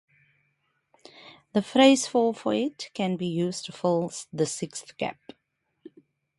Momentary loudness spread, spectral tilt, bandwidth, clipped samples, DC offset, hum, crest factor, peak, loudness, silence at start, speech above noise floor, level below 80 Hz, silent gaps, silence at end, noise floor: 15 LU; -4.5 dB/octave; 11.5 kHz; under 0.1%; under 0.1%; none; 22 dB; -6 dBFS; -26 LUFS; 1.25 s; 51 dB; -72 dBFS; none; 1.25 s; -77 dBFS